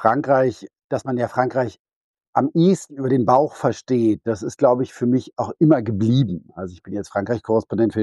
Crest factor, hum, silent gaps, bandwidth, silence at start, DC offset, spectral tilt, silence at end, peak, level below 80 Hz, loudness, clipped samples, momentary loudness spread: 18 dB; none; 0.84-0.89 s, 1.79-1.85 s, 1.96-2.14 s, 2.28-2.33 s; 11.5 kHz; 0 s; under 0.1%; -7.5 dB/octave; 0 s; -2 dBFS; -58 dBFS; -20 LUFS; under 0.1%; 11 LU